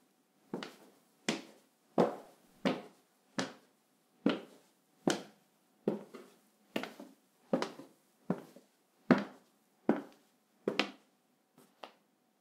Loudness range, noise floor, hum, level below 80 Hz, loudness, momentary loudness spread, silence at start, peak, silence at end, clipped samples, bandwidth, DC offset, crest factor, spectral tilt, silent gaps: 5 LU; -74 dBFS; none; -82 dBFS; -38 LUFS; 22 LU; 0.55 s; -8 dBFS; 0.5 s; under 0.1%; 16 kHz; under 0.1%; 32 dB; -5 dB/octave; none